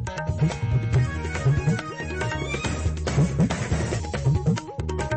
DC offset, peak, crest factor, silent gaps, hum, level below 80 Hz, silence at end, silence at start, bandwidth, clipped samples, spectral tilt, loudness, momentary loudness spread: under 0.1%; -10 dBFS; 14 dB; none; none; -34 dBFS; 0 s; 0 s; 8.8 kHz; under 0.1%; -6.5 dB/octave; -25 LUFS; 6 LU